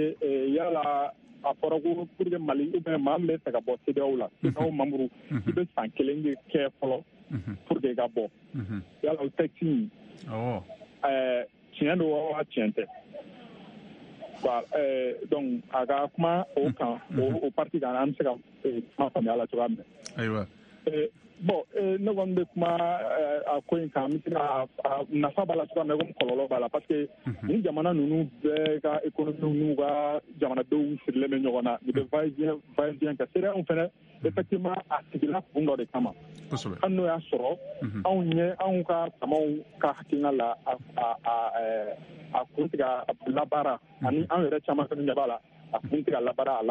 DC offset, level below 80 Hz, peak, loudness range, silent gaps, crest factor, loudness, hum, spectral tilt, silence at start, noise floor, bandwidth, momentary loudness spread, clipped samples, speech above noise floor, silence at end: under 0.1%; -68 dBFS; -10 dBFS; 3 LU; none; 20 dB; -29 LUFS; none; -8 dB/octave; 0 s; -48 dBFS; 9 kHz; 8 LU; under 0.1%; 20 dB; 0 s